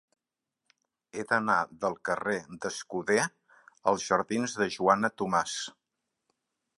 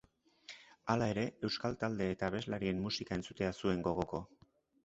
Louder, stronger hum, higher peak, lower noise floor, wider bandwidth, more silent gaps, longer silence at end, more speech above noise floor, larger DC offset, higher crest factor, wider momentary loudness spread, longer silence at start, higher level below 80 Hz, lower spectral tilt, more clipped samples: first, -29 LUFS vs -37 LUFS; neither; first, -8 dBFS vs -16 dBFS; first, -87 dBFS vs -59 dBFS; first, 11.5 kHz vs 8 kHz; neither; first, 1.1 s vs 0.6 s; first, 58 dB vs 22 dB; neither; about the same, 24 dB vs 22 dB; second, 11 LU vs 17 LU; first, 1.15 s vs 0.5 s; second, -70 dBFS vs -60 dBFS; second, -3.5 dB/octave vs -5 dB/octave; neither